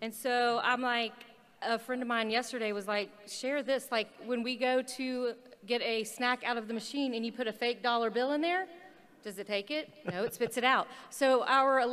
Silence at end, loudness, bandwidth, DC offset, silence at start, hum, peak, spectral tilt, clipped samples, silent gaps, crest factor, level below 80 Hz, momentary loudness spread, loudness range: 0 s; -32 LUFS; 15 kHz; under 0.1%; 0 s; none; -12 dBFS; -3 dB/octave; under 0.1%; none; 20 dB; -82 dBFS; 10 LU; 2 LU